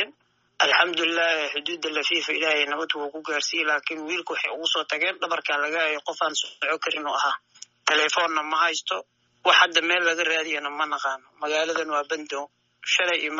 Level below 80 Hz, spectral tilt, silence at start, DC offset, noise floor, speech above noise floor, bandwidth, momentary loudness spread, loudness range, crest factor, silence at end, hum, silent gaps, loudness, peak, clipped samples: -84 dBFS; 3 dB/octave; 0 s; under 0.1%; -59 dBFS; 34 dB; 7.6 kHz; 10 LU; 4 LU; 22 dB; 0 s; none; none; -23 LUFS; -4 dBFS; under 0.1%